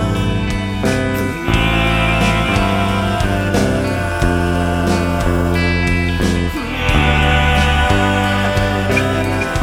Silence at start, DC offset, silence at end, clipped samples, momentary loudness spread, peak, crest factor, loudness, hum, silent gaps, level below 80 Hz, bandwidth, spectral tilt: 0 s; under 0.1%; 0 s; under 0.1%; 5 LU; 0 dBFS; 14 dB; -15 LUFS; none; none; -22 dBFS; 16.5 kHz; -5.5 dB/octave